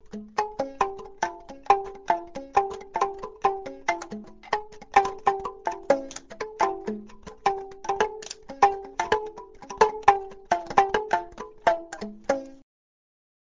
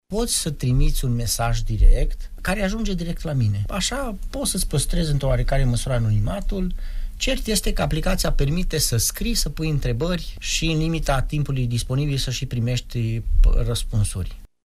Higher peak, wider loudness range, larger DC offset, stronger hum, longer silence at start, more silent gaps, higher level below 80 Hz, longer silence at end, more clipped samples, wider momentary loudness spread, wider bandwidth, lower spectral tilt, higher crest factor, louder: about the same, -2 dBFS vs -4 dBFS; first, 4 LU vs 1 LU; neither; neither; about the same, 0.05 s vs 0.1 s; neither; second, -56 dBFS vs -24 dBFS; first, 0.85 s vs 0.2 s; neither; first, 16 LU vs 5 LU; second, 7.6 kHz vs 15.5 kHz; about the same, -3.5 dB/octave vs -4.5 dB/octave; first, 26 dB vs 16 dB; second, -27 LUFS vs -23 LUFS